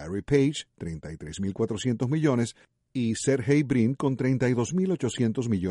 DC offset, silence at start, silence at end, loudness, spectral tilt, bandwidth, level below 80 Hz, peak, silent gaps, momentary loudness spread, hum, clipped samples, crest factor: under 0.1%; 0 s; 0 s; -26 LUFS; -6.5 dB/octave; 11.5 kHz; -54 dBFS; -10 dBFS; none; 12 LU; none; under 0.1%; 16 dB